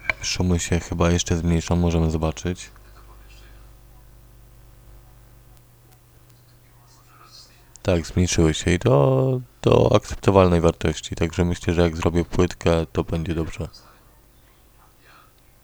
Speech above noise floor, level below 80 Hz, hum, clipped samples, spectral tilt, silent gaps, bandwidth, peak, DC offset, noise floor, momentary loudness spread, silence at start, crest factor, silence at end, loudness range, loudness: 33 dB; -36 dBFS; none; under 0.1%; -6 dB/octave; none; over 20 kHz; 0 dBFS; under 0.1%; -53 dBFS; 10 LU; 0 s; 22 dB; 1.85 s; 11 LU; -21 LUFS